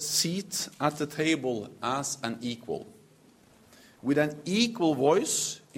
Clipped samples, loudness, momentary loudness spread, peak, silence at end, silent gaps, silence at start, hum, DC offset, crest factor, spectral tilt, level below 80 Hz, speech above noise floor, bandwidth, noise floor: under 0.1%; -29 LUFS; 11 LU; -10 dBFS; 0 s; none; 0 s; none; under 0.1%; 20 dB; -3.5 dB/octave; -70 dBFS; 30 dB; 16 kHz; -59 dBFS